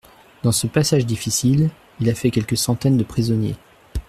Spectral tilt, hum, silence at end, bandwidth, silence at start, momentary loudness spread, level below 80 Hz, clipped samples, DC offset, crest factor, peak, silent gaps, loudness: -5.5 dB/octave; none; 0.1 s; 15 kHz; 0.45 s; 6 LU; -40 dBFS; under 0.1%; under 0.1%; 16 dB; -4 dBFS; none; -20 LUFS